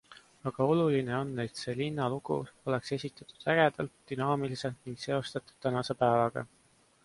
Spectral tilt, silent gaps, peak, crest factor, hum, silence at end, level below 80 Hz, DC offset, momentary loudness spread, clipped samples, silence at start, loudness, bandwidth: -6.5 dB/octave; none; -12 dBFS; 20 dB; none; 0.6 s; -66 dBFS; under 0.1%; 13 LU; under 0.1%; 0.1 s; -32 LUFS; 11.5 kHz